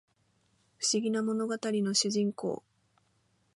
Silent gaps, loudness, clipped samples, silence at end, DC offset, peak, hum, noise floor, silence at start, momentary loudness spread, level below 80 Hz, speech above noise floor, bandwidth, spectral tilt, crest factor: none; -30 LUFS; under 0.1%; 1 s; under 0.1%; -14 dBFS; none; -72 dBFS; 0.8 s; 9 LU; -80 dBFS; 42 dB; 11.5 kHz; -3.5 dB/octave; 20 dB